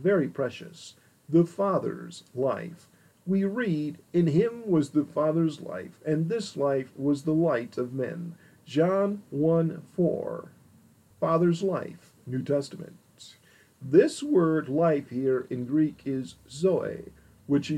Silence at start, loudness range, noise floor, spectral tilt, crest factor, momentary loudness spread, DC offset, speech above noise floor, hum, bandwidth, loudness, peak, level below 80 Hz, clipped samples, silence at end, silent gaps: 0 s; 3 LU; -59 dBFS; -7.5 dB/octave; 20 dB; 16 LU; under 0.1%; 32 dB; none; 12 kHz; -27 LUFS; -8 dBFS; -70 dBFS; under 0.1%; 0 s; none